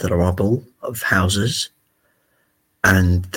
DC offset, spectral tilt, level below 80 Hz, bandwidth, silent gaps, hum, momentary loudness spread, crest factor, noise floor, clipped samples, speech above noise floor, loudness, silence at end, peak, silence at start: under 0.1%; -5 dB/octave; -38 dBFS; 17 kHz; none; none; 9 LU; 18 dB; -65 dBFS; under 0.1%; 47 dB; -19 LUFS; 0 s; 0 dBFS; 0 s